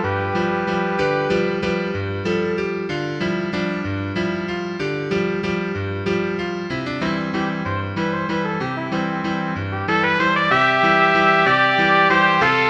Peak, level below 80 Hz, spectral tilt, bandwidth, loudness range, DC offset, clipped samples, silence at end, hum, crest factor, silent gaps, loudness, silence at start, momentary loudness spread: -2 dBFS; -50 dBFS; -6 dB/octave; 8.6 kHz; 7 LU; under 0.1%; under 0.1%; 0 s; none; 18 dB; none; -20 LUFS; 0 s; 10 LU